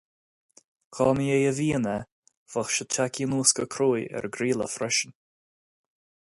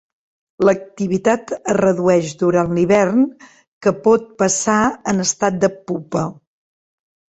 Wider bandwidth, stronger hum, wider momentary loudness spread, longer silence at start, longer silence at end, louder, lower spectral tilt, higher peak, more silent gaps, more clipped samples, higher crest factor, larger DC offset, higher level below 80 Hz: first, 11.5 kHz vs 8.6 kHz; neither; first, 11 LU vs 7 LU; first, 0.9 s vs 0.6 s; first, 1.2 s vs 1.05 s; second, -26 LUFS vs -17 LUFS; second, -3.5 dB/octave vs -5 dB/octave; second, -6 dBFS vs -2 dBFS; first, 2.12-2.23 s, 2.37-2.46 s vs 3.68-3.81 s; neither; first, 22 dB vs 16 dB; neither; second, -60 dBFS vs -54 dBFS